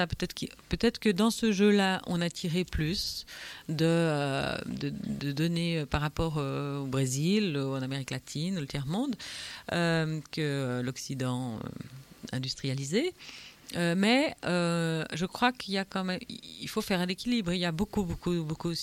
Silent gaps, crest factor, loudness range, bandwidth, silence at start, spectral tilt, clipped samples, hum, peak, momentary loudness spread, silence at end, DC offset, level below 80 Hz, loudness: none; 20 dB; 4 LU; 16.5 kHz; 0 s; -5.5 dB/octave; under 0.1%; none; -10 dBFS; 11 LU; 0 s; under 0.1%; -50 dBFS; -30 LUFS